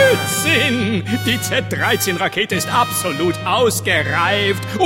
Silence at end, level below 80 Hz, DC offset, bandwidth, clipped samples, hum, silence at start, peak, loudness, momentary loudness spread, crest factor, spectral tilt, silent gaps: 0 s; -50 dBFS; under 0.1%; 17 kHz; under 0.1%; none; 0 s; -2 dBFS; -16 LUFS; 5 LU; 16 dB; -3.5 dB/octave; none